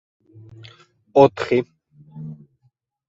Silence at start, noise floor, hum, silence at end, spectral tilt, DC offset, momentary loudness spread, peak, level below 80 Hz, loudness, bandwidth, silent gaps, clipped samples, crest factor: 1.15 s; -65 dBFS; none; 0.75 s; -7.5 dB/octave; under 0.1%; 22 LU; 0 dBFS; -60 dBFS; -18 LUFS; 7.8 kHz; none; under 0.1%; 22 dB